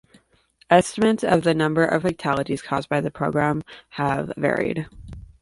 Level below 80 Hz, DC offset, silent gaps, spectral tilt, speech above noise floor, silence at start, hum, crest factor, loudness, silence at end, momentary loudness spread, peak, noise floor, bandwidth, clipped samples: -50 dBFS; under 0.1%; none; -6 dB/octave; 38 dB; 0.7 s; none; 20 dB; -22 LUFS; 0.2 s; 12 LU; -2 dBFS; -60 dBFS; 11.5 kHz; under 0.1%